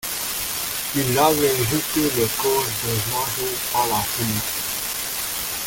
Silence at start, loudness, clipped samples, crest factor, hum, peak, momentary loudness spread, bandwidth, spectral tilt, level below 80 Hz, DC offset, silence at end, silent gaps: 0 s; -21 LUFS; under 0.1%; 20 dB; none; -2 dBFS; 6 LU; 17 kHz; -3 dB/octave; -48 dBFS; under 0.1%; 0 s; none